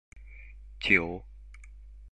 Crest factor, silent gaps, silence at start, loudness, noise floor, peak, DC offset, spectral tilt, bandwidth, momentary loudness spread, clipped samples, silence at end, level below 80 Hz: 26 dB; none; 0.15 s; -26 LUFS; -48 dBFS; -6 dBFS; 0.1%; -5 dB/octave; 10.5 kHz; 26 LU; under 0.1%; 0 s; -48 dBFS